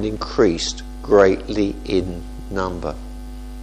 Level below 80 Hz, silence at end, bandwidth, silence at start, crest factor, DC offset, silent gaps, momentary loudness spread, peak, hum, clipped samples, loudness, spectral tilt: -34 dBFS; 0 s; 14.5 kHz; 0 s; 20 dB; under 0.1%; none; 20 LU; 0 dBFS; none; under 0.1%; -20 LUFS; -5 dB/octave